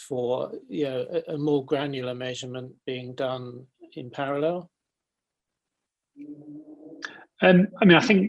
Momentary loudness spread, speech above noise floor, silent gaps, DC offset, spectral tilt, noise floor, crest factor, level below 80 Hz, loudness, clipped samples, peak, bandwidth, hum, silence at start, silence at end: 25 LU; 62 dB; none; under 0.1%; -6.5 dB/octave; -86 dBFS; 22 dB; -68 dBFS; -25 LUFS; under 0.1%; -4 dBFS; 9 kHz; none; 0 s; 0 s